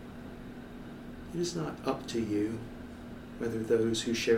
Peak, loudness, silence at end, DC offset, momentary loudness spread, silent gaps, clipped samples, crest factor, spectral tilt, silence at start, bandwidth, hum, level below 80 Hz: -14 dBFS; -33 LUFS; 0 s; under 0.1%; 17 LU; none; under 0.1%; 20 dB; -5 dB/octave; 0 s; 16.5 kHz; none; -54 dBFS